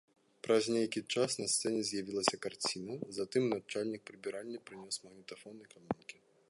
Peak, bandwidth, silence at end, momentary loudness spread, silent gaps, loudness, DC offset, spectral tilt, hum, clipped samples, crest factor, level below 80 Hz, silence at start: -10 dBFS; 11.5 kHz; 0.35 s; 18 LU; none; -36 LUFS; under 0.1%; -3 dB/octave; none; under 0.1%; 26 dB; -76 dBFS; 0.45 s